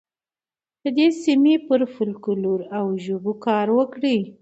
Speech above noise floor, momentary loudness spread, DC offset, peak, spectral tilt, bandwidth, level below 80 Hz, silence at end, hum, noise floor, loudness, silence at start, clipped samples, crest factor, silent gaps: over 70 dB; 8 LU; under 0.1%; -6 dBFS; -6.5 dB/octave; 8.2 kHz; -72 dBFS; 0.1 s; none; under -90 dBFS; -21 LUFS; 0.85 s; under 0.1%; 14 dB; none